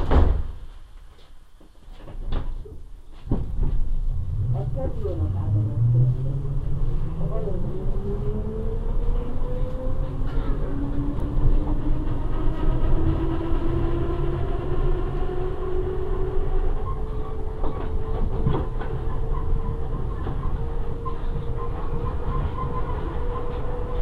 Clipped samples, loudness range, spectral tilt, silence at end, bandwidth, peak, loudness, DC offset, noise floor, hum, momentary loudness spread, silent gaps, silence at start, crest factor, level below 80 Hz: under 0.1%; 5 LU; -9.5 dB/octave; 0 s; 4 kHz; -4 dBFS; -28 LUFS; 0.3%; -46 dBFS; none; 7 LU; none; 0 s; 18 dB; -24 dBFS